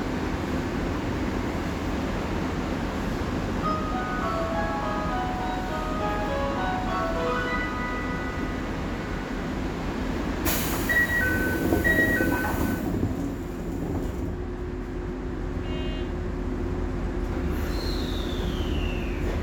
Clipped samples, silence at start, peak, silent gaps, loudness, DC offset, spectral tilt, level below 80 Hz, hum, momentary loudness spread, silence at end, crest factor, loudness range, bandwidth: under 0.1%; 0 s; -8 dBFS; none; -28 LUFS; under 0.1%; -5.5 dB/octave; -34 dBFS; none; 8 LU; 0 s; 18 dB; 7 LU; over 20 kHz